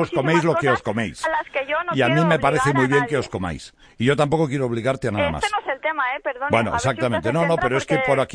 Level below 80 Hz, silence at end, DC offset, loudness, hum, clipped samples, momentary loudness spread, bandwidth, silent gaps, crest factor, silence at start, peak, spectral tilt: -46 dBFS; 0 s; under 0.1%; -21 LUFS; none; under 0.1%; 6 LU; 10.5 kHz; none; 18 dB; 0 s; -4 dBFS; -6 dB/octave